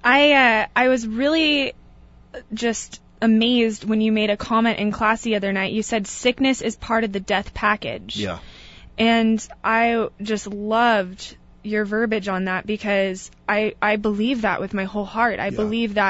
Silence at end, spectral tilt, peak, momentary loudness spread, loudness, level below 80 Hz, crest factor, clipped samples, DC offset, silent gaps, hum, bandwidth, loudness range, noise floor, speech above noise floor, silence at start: 0 s; -4 dB/octave; -4 dBFS; 10 LU; -20 LUFS; -48 dBFS; 18 dB; under 0.1%; under 0.1%; none; none; 8 kHz; 3 LU; -47 dBFS; 27 dB; 0 s